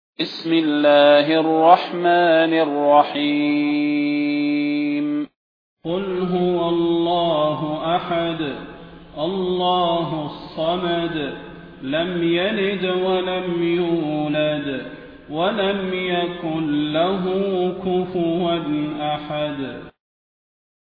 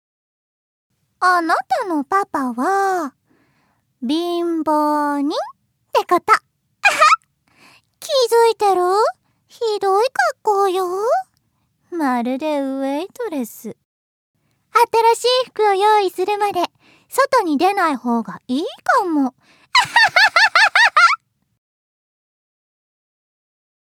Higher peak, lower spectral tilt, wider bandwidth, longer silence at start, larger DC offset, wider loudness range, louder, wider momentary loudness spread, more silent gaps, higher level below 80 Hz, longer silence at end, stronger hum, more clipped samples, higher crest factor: about the same, 0 dBFS vs 0 dBFS; first, -8.5 dB/octave vs -2 dB/octave; second, 5.2 kHz vs 18 kHz; second, 0.2 s vs 1.2 s; neither; about the same, 7 LU vs 7 LU; second, -20 LUFS vs -17 LUFS; about the same, 12 LU vs 13 LU; second, 5.36-5.77 s vs 13.85-14.34 s; first, -54 dBFS vs -70 dBFS; second, 0.95 s vs 2.65 s; neither; neither; about the same, 20 dB vs 18 dB